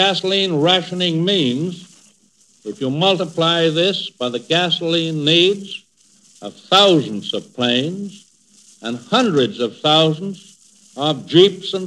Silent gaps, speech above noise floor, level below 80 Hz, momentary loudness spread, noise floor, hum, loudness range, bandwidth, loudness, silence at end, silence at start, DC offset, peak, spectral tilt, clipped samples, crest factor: none; 38 dB; -76 dBFS; 18 LU; -56 dBFS; none; 3 LU; 11.5 kHz; -16 LUFS; 0 s; 0 s; under 0.1%; 0 dBFS; -5 dB/octave; under 0.1%; 18 dB